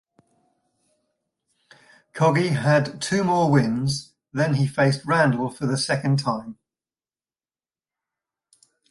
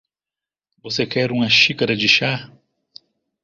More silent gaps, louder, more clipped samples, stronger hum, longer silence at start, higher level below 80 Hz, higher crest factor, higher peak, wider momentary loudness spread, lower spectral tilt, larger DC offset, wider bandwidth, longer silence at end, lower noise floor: neither; second, -22 LUFS vs -16 LUFS; neither; neither; first, 2.15 s vs 0.85 s; about the same, -60 dBFS vs -58 dBFS; about the same, 18 dB vs 22 dB; second, -6 dBFS vs 0 dBFS; about the same, 9 LU vs 11 LU; first, -6 dB/octave vs -4 dB/octave; neither; first, 11.5 kHz vs 7.6 kHz; first, 2.35 s vs 1 s; about the same, under -90 dBFS vs -89 dBFS